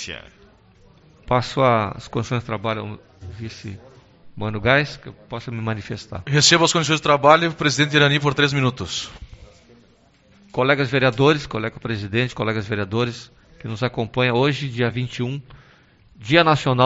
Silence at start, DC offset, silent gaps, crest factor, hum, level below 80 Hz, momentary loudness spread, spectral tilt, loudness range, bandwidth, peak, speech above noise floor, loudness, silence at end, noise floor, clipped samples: 0 s; under 0.1%; none; 22 dB; none; -48 dBFS; 19 LU; -3.5 dB/octave; 8 LU; 8 kHz; 0 dBFS; 35 dB; -19 LUFS; 0 s; -55 dBFS; under 0.1%